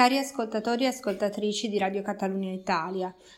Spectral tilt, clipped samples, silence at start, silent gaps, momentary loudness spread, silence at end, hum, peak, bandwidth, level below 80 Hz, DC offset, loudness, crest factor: -4.5 dB/octave; under 0.1%; 0 s; none; 4 LU; 0 s; none; -6 dBFS; 16 kHz; -68 dBFS; under 0.1%; -29 LUFS; 22 dB